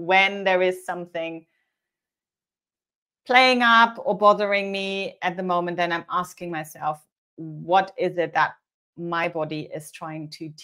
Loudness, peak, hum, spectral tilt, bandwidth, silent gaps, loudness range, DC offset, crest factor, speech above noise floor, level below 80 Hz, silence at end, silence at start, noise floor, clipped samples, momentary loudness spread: -22 LUFS; -2 dBFS; none; -4.5 dB/octave; 16 kHz; 2.95-3.06 s, 7.12-7.37 s, 8.74-8.93 s; 6 LU; under 0.1%; 22 dB; over 67 dB; -74 dBFS; 0 s; 0 s; under -90 dBFS; under 0.1%; 19 LU